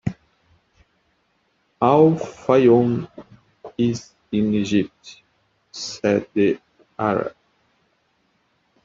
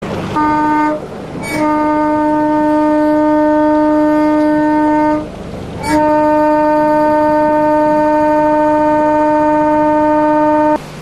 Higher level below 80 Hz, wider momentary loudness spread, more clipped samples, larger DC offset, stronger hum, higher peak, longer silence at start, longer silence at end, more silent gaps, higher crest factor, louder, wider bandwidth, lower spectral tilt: second, -58 dBFS vs -38 dBFS; first, 17 LU vs 6 LU; neither; neither; neither; about the same, -4 dBFS vs -2 dBFS; about the same, 0.05 s vs 0 s; first, 1.55 s vs 0 s; neither; first, 20 dB vs 10 dB; second, -20 LUFS vs -12 LUFS; second, 7.6 kHz vs 12 kHz; about the same, -7 dB/octave vs -7 dB/octave